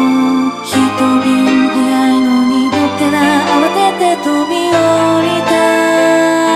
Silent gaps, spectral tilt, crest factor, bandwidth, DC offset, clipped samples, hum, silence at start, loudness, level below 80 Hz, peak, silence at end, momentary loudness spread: none; -4.5 dB/octave; 10 dB; 14.5 kHz; under 0.1%; under 0.1%; none; 0 s; -11 LUFS; -52 dBFS; 0 dBFS; 0 s; 3 LU